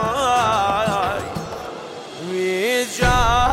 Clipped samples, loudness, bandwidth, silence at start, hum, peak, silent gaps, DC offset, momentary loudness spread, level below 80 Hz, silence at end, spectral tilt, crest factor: under 0.1%; -19 LUFS; 16.5 kHz; 0 s; none; -4 dBFS; none; under 0.1%; 15 LU; -32 dBFS; 0 s; -4 dB/octave; 14 dB